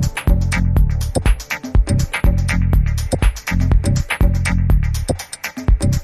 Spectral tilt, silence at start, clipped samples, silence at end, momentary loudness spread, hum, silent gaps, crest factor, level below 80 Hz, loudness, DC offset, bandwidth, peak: -5.5 dB/octave; 0 s; under 0.1%; 0 s; 5 LU; none; none; 14 dB; -18 dBFS; -18 LUFS; under 0.1%; 14 kHz; -2 dBFS